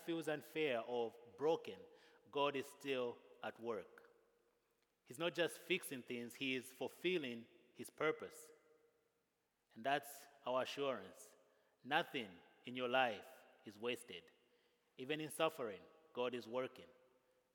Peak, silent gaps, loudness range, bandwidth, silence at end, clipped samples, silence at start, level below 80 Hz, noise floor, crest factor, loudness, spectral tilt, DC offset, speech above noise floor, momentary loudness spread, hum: -20 dBFS; none; 4 LU; 18 kHz; 0.65 s; under 0.1%; 0 s; under -90 dBFS; -86 dBFS; 24 dB; -44 LUFS; -4 dB/octave; under 0.1%; 42 dB; 18 LU; none